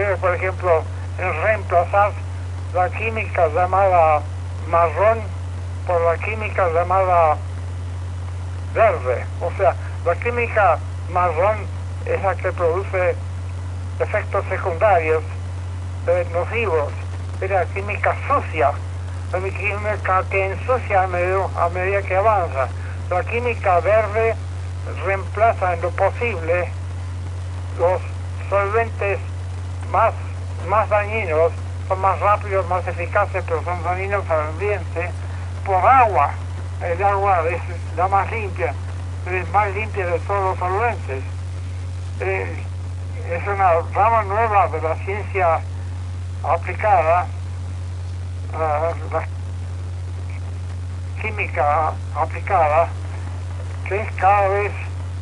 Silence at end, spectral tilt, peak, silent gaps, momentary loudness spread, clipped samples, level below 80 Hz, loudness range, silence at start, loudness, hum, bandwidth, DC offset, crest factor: 0 s; -7 dB/octave; -2 dBFS; none; 12 LU; under 0.1%; -40 dBFS; 4 LU; 0 s; -21 LUFS; none; 10.5 kHz; under 0.1%; 18 dB